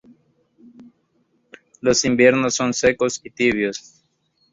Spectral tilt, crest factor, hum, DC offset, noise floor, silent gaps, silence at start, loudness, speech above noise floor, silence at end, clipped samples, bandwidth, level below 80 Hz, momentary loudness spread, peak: -3.5 dB/octave; 20 dB; none; under 0.1%; -66 dBFS; none; 0.8 s; -18 LUFS; 47 dB; 0.75 s; under 0.1%; 7.8 kHz; -54 dBFS; 9 LU; -2 dBFS